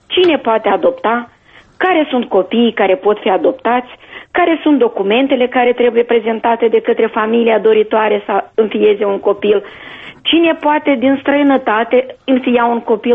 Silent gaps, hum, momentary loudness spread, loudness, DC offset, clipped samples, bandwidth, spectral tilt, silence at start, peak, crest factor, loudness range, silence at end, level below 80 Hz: none; none; 5 LU; -13 LUFS; under 0.1%; under 0.1%; 4.7 kHz; -7.5 dB/octave; 0.1 s; -2 dBFS; 12 dB; 2 LU; 0 s; -54 dBFS